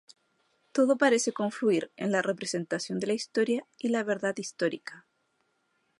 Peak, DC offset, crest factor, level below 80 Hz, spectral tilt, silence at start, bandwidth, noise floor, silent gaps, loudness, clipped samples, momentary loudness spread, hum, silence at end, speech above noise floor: -10 dBFS; under 0.1%; 20 dB; -80 dBFS; -4 dB/octave; 0.75 s; 11.5 kHz; -74 dBFS; none; -29 LUFS; under 0.1%; 9 LU; none; 1 s; 46 dB